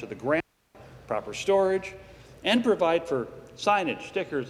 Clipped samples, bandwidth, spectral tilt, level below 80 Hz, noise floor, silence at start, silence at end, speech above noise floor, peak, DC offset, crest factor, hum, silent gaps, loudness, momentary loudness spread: under 0.1%; 13.5 kHz; -4.5 dB/octave; -60 dBFS; -53 dBFS; 0 s; 0 s; 26 dB; -8 dBFS; under 0.1%; 18 dB; none; none; -27 LUFS; 12 LU